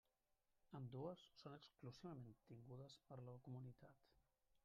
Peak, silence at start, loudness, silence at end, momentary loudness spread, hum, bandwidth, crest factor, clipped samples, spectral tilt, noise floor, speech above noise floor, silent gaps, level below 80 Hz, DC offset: -40 dBFS; 0.65 s; -59 LUFS; 0.05 s; 8 LU; none; 7.2 kHz; 20 dB; under 0.1%; -7 dB/octave; -88 dBFS; 30 dB; none; -86 dBFS; under 0.1%